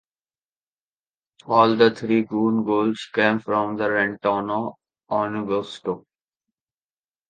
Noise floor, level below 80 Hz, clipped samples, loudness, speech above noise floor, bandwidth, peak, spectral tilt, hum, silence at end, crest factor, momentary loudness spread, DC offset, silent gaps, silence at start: under -90 dBFS; -66 dBFS; under 0.1%; -22 LUFS; over 69 dB; 9 kHz; -2 dBFS; -6.5 dB/octave; none; 1.3 s; 22 dB; 11 LU; under 0.1%; none; 1.45 s